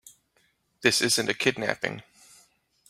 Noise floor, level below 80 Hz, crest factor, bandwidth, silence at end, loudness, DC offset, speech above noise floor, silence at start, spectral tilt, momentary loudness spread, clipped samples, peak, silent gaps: -69 dBFS; -68 dBFS; 26 dB; 16 kHz; 0.9 s; -25 LUFS; under 0.1%; 43 dB; 0.8 s; -2.5 dB/octave; 10 LU; under 0.1%; -4 dBFS; none